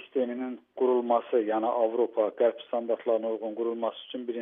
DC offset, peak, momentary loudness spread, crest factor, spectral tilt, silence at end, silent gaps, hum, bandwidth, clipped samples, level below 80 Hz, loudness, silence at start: under 0.1%; -12 dBFS; 8 LU; 16 dB; -3.5 dB/octave; 0 s; none; none; 3.8 kHz; under 0.1%; under -90 dBFS; -29 LUFS; 0 s